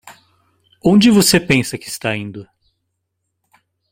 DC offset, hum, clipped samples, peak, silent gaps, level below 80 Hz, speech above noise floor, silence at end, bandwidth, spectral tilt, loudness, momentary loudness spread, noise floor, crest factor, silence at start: under 0.1%; none; under 0.1%; 0 dBFS; none; -48 dBFS; 59 dB; 1.5 s; 16.5 kHz; -4.5 dB/octave; -14 LUFS; 16 LU; -74 dBFS; 18 dB; 0.05 s